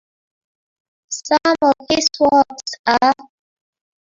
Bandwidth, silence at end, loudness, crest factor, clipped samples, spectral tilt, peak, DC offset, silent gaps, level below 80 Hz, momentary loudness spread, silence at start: 8 kHz; 0.95 s; -16 LUFS; 18 dB; under 0.1%; -2 dB/octave; -2 dBFS; under 0.1%; 2.79-2.84 s; -56 dBFS; 10 LU; 1.1 s